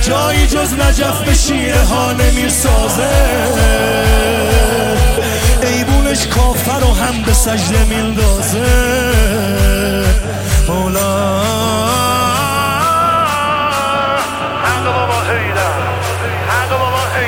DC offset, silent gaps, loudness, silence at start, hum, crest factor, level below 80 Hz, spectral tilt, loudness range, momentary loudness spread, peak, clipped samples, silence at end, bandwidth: under 0.1%; none; -13 LUFS; 0 s; none; 12 dB; -16 dBFS; -4 dB/octave; 2 LU; 3 LU; 0 dBFS; under 0.1%; 0 s; 17 kHz